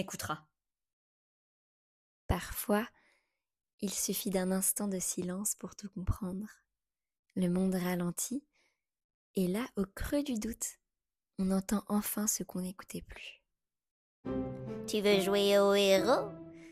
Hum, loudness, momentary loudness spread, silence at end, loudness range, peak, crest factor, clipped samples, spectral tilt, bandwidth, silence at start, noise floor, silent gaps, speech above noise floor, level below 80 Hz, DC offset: none; -33 LUFS; 16 LU; 0 s; 7 LU; -14 dBFS; 20 dB; under 0.1%; -4 dB/octave; 15.5 kHz; 0 s; under -90 dBFS; 0.93-2.29 s, 3.73-3.78 s, 7.19-7.23 s, 9.04-9.34 s, 13.91-14.23 s; over 57 dB; -52 dBFS; under 0.1%